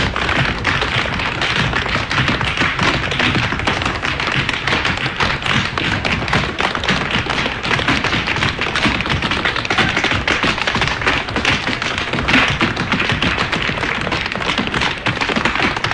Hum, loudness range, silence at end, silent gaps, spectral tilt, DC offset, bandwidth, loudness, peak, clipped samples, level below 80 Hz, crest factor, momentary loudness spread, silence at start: none; 1 LU; 0 s; none; -4 dB/octave; under 0.1%; 11 kHz; -16 LUFS; 0 dBFS; under 0.1%; -32 dBFS; 18 dB; 3 LU; 0 s